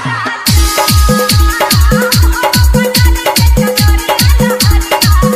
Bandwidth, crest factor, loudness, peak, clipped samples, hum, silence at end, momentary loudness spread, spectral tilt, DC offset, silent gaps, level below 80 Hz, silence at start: 16 kHz; 8 dB; -9 LUFS; 0 dBFS; 0.3%; none; 0 s; 2 LU; -4 dB/octave; under 0.1%; none; -12 dBFS; 0 s